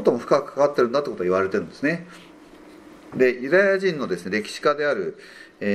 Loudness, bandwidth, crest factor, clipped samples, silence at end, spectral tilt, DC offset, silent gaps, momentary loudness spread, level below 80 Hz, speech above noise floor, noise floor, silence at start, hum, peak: -22 LUFS; 12.5 kHz; 20 dB; under 0.1%; 0 s; -5.5 dB/octave; under 0.1%; none; 12 LU; -64 dBFS; 24 dB; -46 dBFS; 0 s; none; -4 dBFS